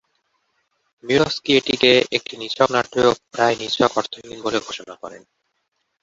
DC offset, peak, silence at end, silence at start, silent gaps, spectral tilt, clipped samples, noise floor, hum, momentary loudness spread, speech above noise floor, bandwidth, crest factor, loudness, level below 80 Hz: under 0.1%; -2 dBFS; 0.85 s; 1.05 s; none; -4 dB/octave; under 0.1%; -73 dBFS; none; 17 LU; 53 dB; 8 kHz; 20 dB; -19 LUFS; -56 dBFS